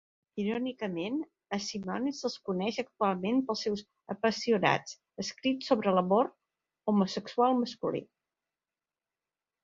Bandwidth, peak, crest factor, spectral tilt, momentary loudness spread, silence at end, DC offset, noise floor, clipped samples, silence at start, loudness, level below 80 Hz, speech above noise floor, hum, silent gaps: 7.6 kHz; -10 dBFS; 22 dB; -5.5 dB/octave; 11 LU; 1.6 s; under 0.1%; under -90 dBFS; under 0.1%; 0.35 s; -31 LUFS; -72 dBFS; over 60 dB; none; none